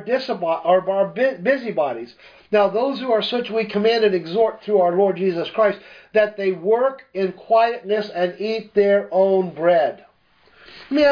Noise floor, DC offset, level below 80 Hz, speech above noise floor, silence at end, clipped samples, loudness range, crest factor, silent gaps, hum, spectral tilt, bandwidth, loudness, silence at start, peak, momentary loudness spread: -56 dBFS; under 0.1%; -64 dBFS; 37 dB; 0 s; under 0.1%; 1 LU; 16 dB; none; none; -7 dB/octave; 5.2 kHz; -20 LUFS; 0 s; -4 dBFS; 6 LU